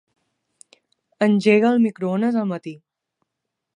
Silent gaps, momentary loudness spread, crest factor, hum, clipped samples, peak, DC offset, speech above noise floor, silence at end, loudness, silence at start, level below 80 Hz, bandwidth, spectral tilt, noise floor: none; 13 LU; 18 dB; none; under 0.1%; -4 dBFS; under 0.1%; 63 dB; 1 s; -19 LUFS; 1.2 s; -72 dBFS; 10.5 kHz; -7 dB/octave; -81 dBFS